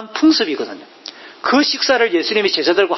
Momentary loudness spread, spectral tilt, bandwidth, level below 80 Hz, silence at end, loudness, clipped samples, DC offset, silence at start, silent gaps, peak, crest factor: 19 LU; -2.5 dB/octave; 6.2 kHz; -62 dBFS; 0 s; -15 LUFS; under 0.1%; under 0.1%; 0 s; none; -2 dBFS; 14 dB